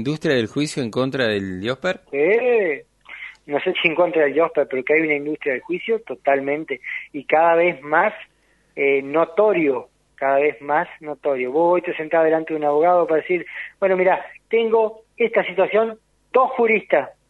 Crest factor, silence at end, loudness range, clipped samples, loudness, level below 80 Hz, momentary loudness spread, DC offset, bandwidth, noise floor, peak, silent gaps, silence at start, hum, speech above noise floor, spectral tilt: 18 dB; 0.2 s; 2 LU; under 0.1%; -20 LUFS; -64 dBFS; 9 LU; under 0.1%; 11.5 kHz; -39 dBFS; -2 dBFS; none; 0 s; none; 19 dB; -5.5 dB/octave